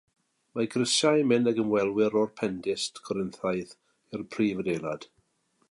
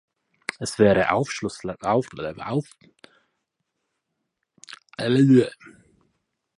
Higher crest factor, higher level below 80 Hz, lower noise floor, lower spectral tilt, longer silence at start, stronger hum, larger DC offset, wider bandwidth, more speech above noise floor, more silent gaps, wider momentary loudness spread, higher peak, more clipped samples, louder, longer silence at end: about the same, 18 dB vs 22 dB; second, -66 dBFS vs -56 dBFS; second, -71 dBFS vs -79 dBFS; second, -4.5 dB/octave vs -6 dB/octave; about the same, 0.55 s vs 0.6 s; neither; neither; about the same, 11.5 kHz vs 11.5 kHz; second, 44 dB vs 57 dB; neither; about the same, 15 LU vs 17 LU; second, -10 dBFS vs -2 dBFS; neither; second, -27 LUFS vs -22 LUFS; second, 0.65 s vs 0.9 s